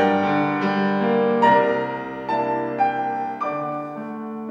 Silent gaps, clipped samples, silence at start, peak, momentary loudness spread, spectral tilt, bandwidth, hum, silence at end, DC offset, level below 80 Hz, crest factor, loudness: none; under 0.1%; 0 s; -4 dBFS; 13 LU; -7.5 dB/octave; 7.4 kHz; none; 0 s; under 0.1%; -62 dBFS; 18 dB; -22 LUFS